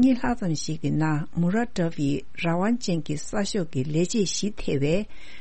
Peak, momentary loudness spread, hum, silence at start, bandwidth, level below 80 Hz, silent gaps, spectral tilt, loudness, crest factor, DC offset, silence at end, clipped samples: -10 dBFS; 4 LU; none; 0 s; 8.8 kHz; -44 dBFS; none; -5.5 dB/octave; -26 LUFS; 14 dB; 3%; 0 s; under 0.1%